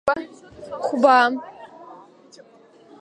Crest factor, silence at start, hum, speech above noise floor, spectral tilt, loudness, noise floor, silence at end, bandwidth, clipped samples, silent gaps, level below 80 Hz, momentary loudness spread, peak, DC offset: 20 dB; 0.05 s; none; 31 dB; -4 dB/octave; -19 LUFS; -51 dBFS; 1.05 s; 10.5 kHz; under 0.1%; none; -64 dBFS; 27 LU; -2 dBFS; under 0.1%